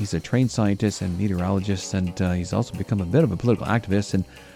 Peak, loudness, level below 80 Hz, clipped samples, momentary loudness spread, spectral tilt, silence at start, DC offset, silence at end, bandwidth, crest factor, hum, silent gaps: -6 dBFS; -24 LUFS; -50 dBFS; under 0.1%; 5 LU; -6.5 dB/octave; 0 s; under 0.1%; 0 s; 14.5 kHz; 16 dB; none; none